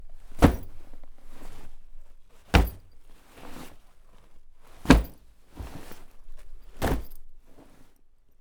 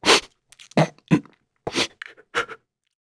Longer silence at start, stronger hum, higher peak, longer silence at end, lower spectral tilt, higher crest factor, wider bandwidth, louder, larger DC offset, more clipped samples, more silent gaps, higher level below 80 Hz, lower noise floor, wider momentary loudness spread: about the same, 0 s vs 0 s; neither; about the same, 0 dBFS vs -2 dBFS; about the same, 0.55 s vs 0.45 s; first, -6 dB/octave vs -3.5 dB/octave; about the same, 28 dB vs 24 dB; first, over 20 kHz vs 11 kHz; about the same, -25 LUFS vs -23 LUFS; neither; neither; neither; first, -34 dBFS vs -58 dBFS; about the same, -54 dBFS vs -51 dBFS; first, 28 LU vs 17 LU